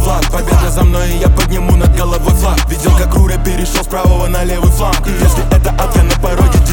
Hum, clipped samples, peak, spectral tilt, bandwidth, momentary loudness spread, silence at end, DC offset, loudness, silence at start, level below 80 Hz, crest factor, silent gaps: none; under 0.1%; 0 dBFS; -5.5 dB/octave; 19 kHz; 4 LU; 0 s; under 0.1%; -12 LUFS; 0 s; -12 dBFS; 10 dB; none